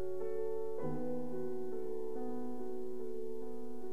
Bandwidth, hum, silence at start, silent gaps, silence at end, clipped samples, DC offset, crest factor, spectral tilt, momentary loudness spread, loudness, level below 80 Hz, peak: 14 kHz; none; 0 s; none; 0 s; under 0.1%; 2%; 12 dB; -8.5 dB/octave; 5 LU; -42 LUFS; -72 dBFS; -26 dBFS